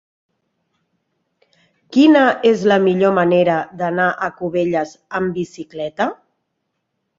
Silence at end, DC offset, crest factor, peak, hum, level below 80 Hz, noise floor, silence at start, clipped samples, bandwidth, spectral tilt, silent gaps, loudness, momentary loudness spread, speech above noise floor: 1.05 s; under 0.1%; 16 dB; -2 dBFS; none; -60 dBFS; -73 dBFS; 1.9 s; under 0.1%; 7.6 kHz; -6.5 dB/octave; none; -16 LUFS; 12 LU; 58 dB